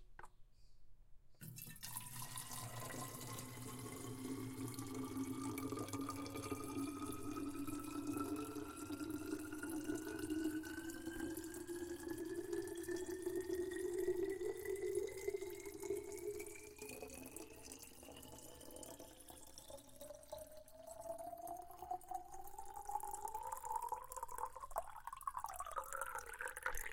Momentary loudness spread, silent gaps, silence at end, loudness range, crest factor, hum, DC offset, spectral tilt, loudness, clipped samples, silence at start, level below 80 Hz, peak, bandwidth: 12 LU; none; 0 s; 10 LU; 22 dB; none; under 0.1%; -4.5 dB/octave; -47 LUFS; under 0.1%; 0 s; -64 dBFS; -26 dBFS; 17 kHz